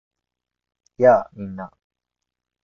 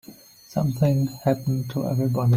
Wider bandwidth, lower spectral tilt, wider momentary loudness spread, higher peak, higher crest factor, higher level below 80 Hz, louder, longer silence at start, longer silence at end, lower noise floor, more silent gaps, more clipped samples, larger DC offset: second, 6.6 kHz vs 16 kHz; about the same, -8.5 dB/octave vs -8 dB/octave; first, 20 LU vs 5 LU; first, -2 dBFS vs -6 dBFS; about the same, 20 dB vs 16 dB; second, -62 dBFS vs -54 dBFS; first, -17 LUFS vs -24 LUFS; first, 1 s vs 0.1 s; first, 1 s vs 0 s; first, -86 dBFS vs -47 dBFS; neither; neither; neither